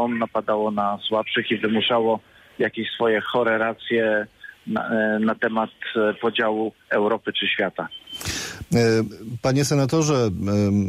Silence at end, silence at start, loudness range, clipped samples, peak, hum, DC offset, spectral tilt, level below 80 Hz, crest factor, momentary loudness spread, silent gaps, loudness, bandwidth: 0 s; 0 s; 1 LU; under 0.1%; -8 dBFS; none; under 0.1%; -5 dB/octave; -54 dBFS; 14 dB; 8 LU; none; -22 LUFS; 15.5 kHz